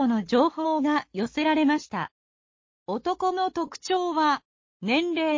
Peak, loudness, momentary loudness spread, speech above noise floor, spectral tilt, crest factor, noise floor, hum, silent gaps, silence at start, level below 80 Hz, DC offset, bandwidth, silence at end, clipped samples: -10 dBFS; -26 LUFS; 11 LU; over 65 dB; -5 dB/octave; 16 dB; under -90 dBFS; none; 2.11-2.86 s, 4.45-4.80 s; 0 s; -64 dBFS; under 0.1%; 7.6 kHz; 0 s; under 0.1%